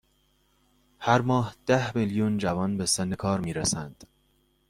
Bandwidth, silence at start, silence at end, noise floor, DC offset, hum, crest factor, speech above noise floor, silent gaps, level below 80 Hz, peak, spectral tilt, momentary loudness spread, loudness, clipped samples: 15 kHz; 1 s; 0.65 s; -68 dBFS; under 0.1%; none; 22 dB; 41 dB; none; -56 dBFS; -6 dBFS; -4.5 dB/octave; 5 LU; -26 LUFS; under 0.1%